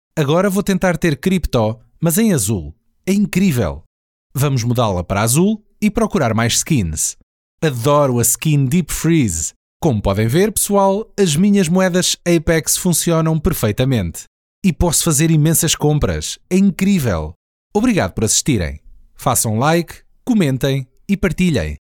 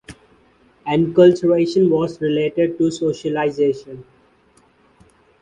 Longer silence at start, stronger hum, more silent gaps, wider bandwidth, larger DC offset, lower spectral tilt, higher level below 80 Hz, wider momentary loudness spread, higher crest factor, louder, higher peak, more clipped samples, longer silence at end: about the same, 0.15 s vs 0.1 s; neither; first, 3.86-4.30 s, 7.23-7.58 s, 9.56-9.80 s, 14.27-14.62 s, 17.36-17.70 s vs none; first, 19 kHz vs 9.8 kHz; neither; second, -5 dB/octave vs -7 dB/octave; first, -34 dBFS vs -56 dBFS; second, 8 LU vs 14 LU; about the same, 14 dB vs 18 dB; about the same, -16 LUFS vs -17 LUFS; about the same, -2 dBFS vs -2 dBFS; neither; second, 0.1 s vs 1.4 s